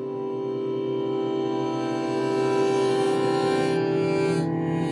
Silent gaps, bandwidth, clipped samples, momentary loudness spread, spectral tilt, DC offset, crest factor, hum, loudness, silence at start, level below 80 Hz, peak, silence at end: none; 11.5 kHz; under 0.1%; 5 LU; -6.5 dB/octave; under 0.1%; 12 dB; none; -25 LUFS; 0 s; -70 dBFS; -12 dBFS; 0 s